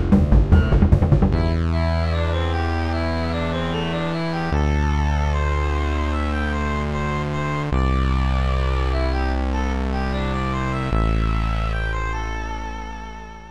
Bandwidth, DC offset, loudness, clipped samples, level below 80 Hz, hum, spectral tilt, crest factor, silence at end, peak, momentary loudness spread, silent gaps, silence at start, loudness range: 8.6 kHz; 1%; -22 LUFS; under 0.1%; -24 dBFS; none; -7.5 dB/octave; 18 dB; 0 s; -2 dBFS; 8 LU; none; 0 s; 4 LU